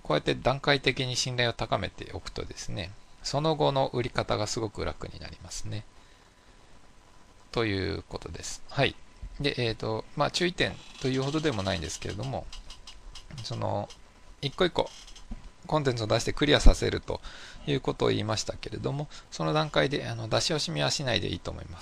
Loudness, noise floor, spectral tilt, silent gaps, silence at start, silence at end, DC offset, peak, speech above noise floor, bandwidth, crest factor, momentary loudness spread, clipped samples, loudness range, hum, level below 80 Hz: -29 LUFS; -56 dBFS; -4.5 dB/octave; none; 0.05 s; 0 s; under 0.1%; -2 dBFS; 27 dB; 13 kHz; 26 dB; 15 LU; under 0.1%; 7 LU; none; -36 dBFS